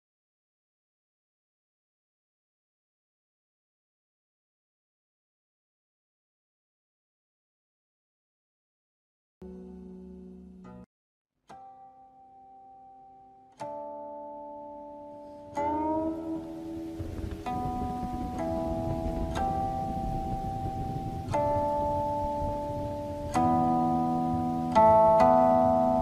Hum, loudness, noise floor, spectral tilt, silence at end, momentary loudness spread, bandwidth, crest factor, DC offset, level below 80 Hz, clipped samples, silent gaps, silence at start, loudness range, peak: none; -28 LUFS; -55 dBFS; -8 dB/octave; 0 s; 24 LU; 14.5 kHz; 22 dB; under 0.1%; -46 dBFS; under 0.1%; 10.86-11.25 s; 9.4 s; 24 LU; -8 dBFS